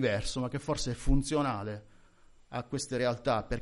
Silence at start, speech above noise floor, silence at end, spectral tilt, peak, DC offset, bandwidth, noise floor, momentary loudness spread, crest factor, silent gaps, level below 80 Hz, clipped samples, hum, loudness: 0 s; 28 dB; 0 s; -5 dB/octave; -14 dBFS; under 0.1%; 11.5 kHz; -58 dBFS; 11 LU; 18 dB; none; -40 dBFS; under 0.1%; none; -33 LUFS